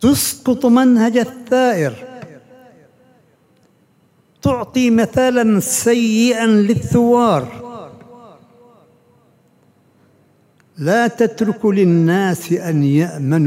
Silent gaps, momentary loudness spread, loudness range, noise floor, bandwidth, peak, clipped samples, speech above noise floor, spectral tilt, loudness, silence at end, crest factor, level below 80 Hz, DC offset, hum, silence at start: none; 10 LU; 9 LU; -56 dBFS; 16 kHz; -2 dBFS; under 0.1%; 42 dB; -5.5 dB/octave; -15 LUFS; 0 s; 14 dB; -52 dBFS; under 0.1%; none; 0 s